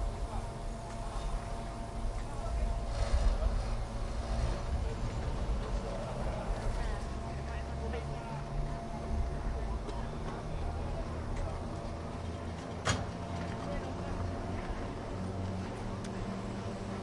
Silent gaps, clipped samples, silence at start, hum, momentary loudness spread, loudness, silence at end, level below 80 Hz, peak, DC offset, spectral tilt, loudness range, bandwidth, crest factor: none; under 0.1%; 0 s; none; 5 LU; -38 LUFS; 0 s; -38 dBFS; -18 dBFS; under 0.1%; -6 dB/octave; 3 LU; 11.5 kHz; 18 dB